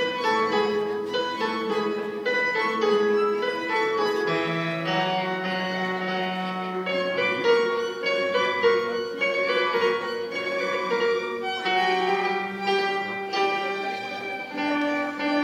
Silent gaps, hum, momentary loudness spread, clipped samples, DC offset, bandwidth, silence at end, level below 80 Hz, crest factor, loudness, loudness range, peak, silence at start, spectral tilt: none; none; 6 LU; under 0.1%; under 0.1%; 15.5 kHz; 0 s; -76 dBFS; 16 dB; -25 LUFS; 2 LU; -8 dBFS; 0 s; -4.5 dB/octave